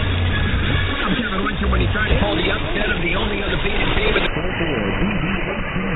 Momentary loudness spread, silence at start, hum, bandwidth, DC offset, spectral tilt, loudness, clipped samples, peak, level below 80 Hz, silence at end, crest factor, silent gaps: 3 LU; 0 s; none; 4.3 kHz; under 0.1%; -9.5 dB/octave; -20 LUFS; under 0.1%; -4 dBFS; -24 dBFS; 0 s; 16 dB; none